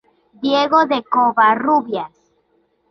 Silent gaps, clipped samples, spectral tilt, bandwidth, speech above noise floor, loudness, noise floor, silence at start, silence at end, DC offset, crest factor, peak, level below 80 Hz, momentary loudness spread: none; under 0.1%; -5 dB/octave; 6.4 kHz; 47 dB; -16 LUFS; -62 dBFS; 0.4 s; 0.85 s; under 0.1%; 16 dB; -2 dBFS; -64 dBFS; 12 LU